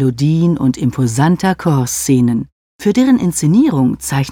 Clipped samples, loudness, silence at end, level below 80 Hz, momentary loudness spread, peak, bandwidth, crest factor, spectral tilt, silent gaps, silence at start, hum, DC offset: under 0.1%; -14 LUFS; 0 s; -44 dBFS; 5 LU; 0 dBFS; 17.5 kHz; 12 dB; -6 dB/octave; 2.52-2.79 s; 0 s; none; under 0.1%